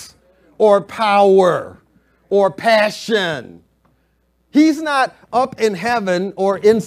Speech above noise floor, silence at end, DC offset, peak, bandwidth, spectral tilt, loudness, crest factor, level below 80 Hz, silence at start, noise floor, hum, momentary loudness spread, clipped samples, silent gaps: 47 dB; 0 s; under 0.1%; 0 dBFS; 15 kHz; -5 dB/octave; -16 LUFS; 16 dB; -60 dBFS; 0 s; -62 dBFS; none; 7 LU; under 0.1%; none